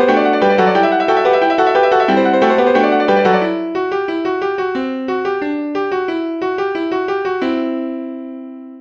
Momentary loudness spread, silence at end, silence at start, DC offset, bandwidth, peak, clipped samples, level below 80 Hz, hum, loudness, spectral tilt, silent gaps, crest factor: 8 LU; 0 s; 0 s; under 0.1%; 7.4 kHz; 0 dBFS; under 0.1%; -58 dBFS; none; -15 LUFS; -6.5 dB/octave; none; 14 dB